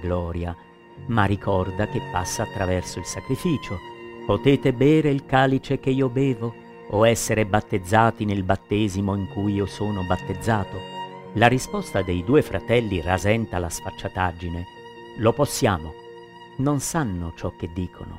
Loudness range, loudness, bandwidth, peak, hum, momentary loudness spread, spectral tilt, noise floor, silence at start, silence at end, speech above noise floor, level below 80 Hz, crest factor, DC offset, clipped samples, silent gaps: 4 LU; -23 LUFS; 16 kHz; -2 dBFS; none; 14 LU; -5.5 dB/octave; -43 dBFS; 0 s; 0 s; 20 dB; -44 dBFS; 22 dB; under 0.1%; under 0.1%; none